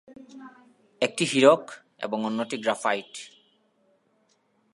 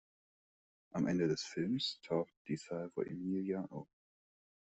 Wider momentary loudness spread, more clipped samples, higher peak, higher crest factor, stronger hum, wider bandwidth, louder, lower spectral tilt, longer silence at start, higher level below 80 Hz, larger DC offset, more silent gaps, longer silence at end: first, 27 LU vs 10 LU; neither; first, -4 dBFS vs -22 dBFS; first, 24 dB vs 18 dB; neither; first, 11.5 kHz vs 8.2 kHz; first, -25 LUFS vs -39 LUFS; second, -4 dB/octave vs -6 dB/octave; second, 0.1 s vs 0.95 s; second, -82 dBFS vs -76 dBFS; neither; second, none vs 2.37-2.45 s; first, 1.45 s vs 0.8 s